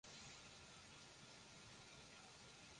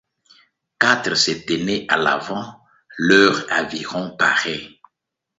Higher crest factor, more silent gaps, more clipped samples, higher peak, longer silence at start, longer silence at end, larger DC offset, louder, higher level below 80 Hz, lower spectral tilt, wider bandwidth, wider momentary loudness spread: second, 14 dB vs 20 dB; neither; neither; second, -48 dBFS vs 0 dBFS; second, 0.05 s vs 0.8 s; second, 0 s vs 0.7 s; neither; second, -60 LUFS vs -18 LUFS; second, -78 dBFS vs -58 dBFS; about the same, -2 dB/octave vs -3 dB/octave; first, 11 kHz vs 8 kHz; second, 3 LU vs 14 LU